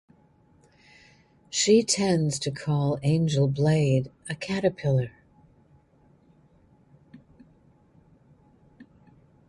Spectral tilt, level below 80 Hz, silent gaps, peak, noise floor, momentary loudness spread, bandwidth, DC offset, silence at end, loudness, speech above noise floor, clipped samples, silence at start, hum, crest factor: -5.5 dB/octave; -60 dBFS; none; -8 dBFS; -60 dBFS; 10 LU; 11.5 kHz; under 0.1%; 0.65 s; -25 LUFS; 36 dB; under 0.1%; 1.5 s; none; 20 dB